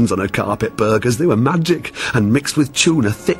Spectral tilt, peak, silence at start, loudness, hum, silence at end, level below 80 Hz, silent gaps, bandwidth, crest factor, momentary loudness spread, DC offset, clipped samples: -5 dB/octave; 0 dBFS; 0 s; -16 LUFS; none; 0 s; -46 dBFS; none; 16.5 kHz; 16 dB; 5 LU; under 0.1%; under 0.1%